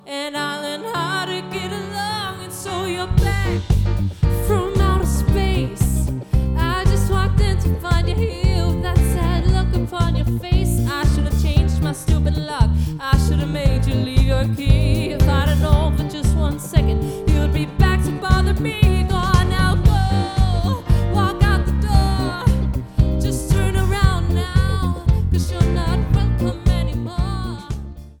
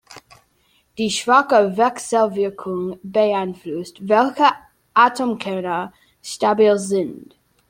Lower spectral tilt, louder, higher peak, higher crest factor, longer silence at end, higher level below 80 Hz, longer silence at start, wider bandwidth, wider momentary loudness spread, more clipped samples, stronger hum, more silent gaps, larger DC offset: first, -6.5 dB/octave vs -4.5 dB/octave; about the same, -19 LUFS vs -19 LUFS; about the same, 0 dBFS vs -2 dBFS; about the same, 18 dB vs 18 dB; second, 0.1 s vs 0.45 s; first, -20 dBFS vs -64 dBFS; about the same, 0.05 s vs 0.1 s; first, 18 kHz vs 16 kHz; second, 7 LU vs 14 LU; neither; neither; neither; neither